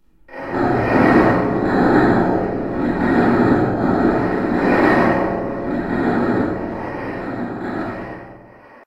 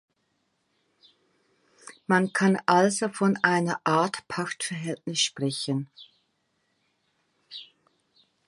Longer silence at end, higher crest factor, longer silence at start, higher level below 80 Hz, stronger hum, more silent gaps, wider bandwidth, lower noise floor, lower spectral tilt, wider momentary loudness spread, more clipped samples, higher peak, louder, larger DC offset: second, 0.45 s vs 0.85 s; second, 16 dB vs 24 dB; second, 0.3 s vs 1.85 s; first, -38 dBFS vs -74 dBFS; neither; neither; second, 10 kHz vs 11.5 kHz; second, -43 dBFS vs -74 dBFS; first, -8.5 dB/octave vs -4 dB/octave; second, 12 LU vs 21 LU; neither; first, 0 dBFS vs -6 dBFS; first, -18 LUFS vs -25 LUFS; neither